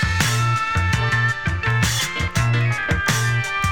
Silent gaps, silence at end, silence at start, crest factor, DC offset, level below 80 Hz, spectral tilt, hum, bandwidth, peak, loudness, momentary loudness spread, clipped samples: none; 0 s; 0 s; 16 dB; 0.9%; -34 dBFS; -4 dB/octave; none; 18 kHz; -4 dBFS; -19 LUFS; 2 LU; under 0.1%